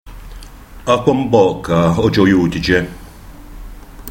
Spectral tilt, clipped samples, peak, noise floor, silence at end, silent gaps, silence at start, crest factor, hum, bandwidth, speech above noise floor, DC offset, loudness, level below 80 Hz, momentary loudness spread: -6.5 dB/octave; under 0.1%; 0 dBFS; -35 dBFS; 0 s; none; 0.05 s; 16 dB; none; 16.5 kHz; 22 dB; under 0.1%; -14 LUFS; -34 dBFS; 11 LU